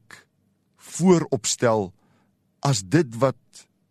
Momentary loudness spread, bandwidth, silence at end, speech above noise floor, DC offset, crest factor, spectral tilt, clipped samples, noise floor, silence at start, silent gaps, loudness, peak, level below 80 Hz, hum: 14 LU; 13 kHz; 0.3 s; 46 dB; under 0.1%; 20 dB; -5 dB/octave; under 0.1%; -67 dBFS; 0.9 s; none; -22 LUFS; -4 dBFS; -62 dBFS; none